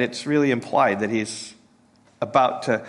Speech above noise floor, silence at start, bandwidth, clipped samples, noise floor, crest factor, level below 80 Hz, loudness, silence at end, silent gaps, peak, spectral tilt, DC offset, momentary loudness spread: 35 dB; 0 s; 11.5 kHz; under 0.1%; -57 dBFS; 18 dB; -68 dBFS; -22 LUFS; 0 s; none; -4 dBFS; -5 dB/octave; under 0.1%; 12 LU